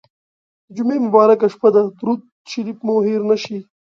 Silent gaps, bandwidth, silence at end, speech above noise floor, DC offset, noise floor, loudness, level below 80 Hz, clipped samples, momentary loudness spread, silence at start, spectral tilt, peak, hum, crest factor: 2.32-2.45 s; 7.2 kHz; 0.35 s; over 74 dB; under 0.1%; under -90 dBFS; -17 LUFS; -68 dBFS; under 0.1%; 16 LU; 0.75 s; -6.5 dB/octave; 0 dBFS; none; 18 dB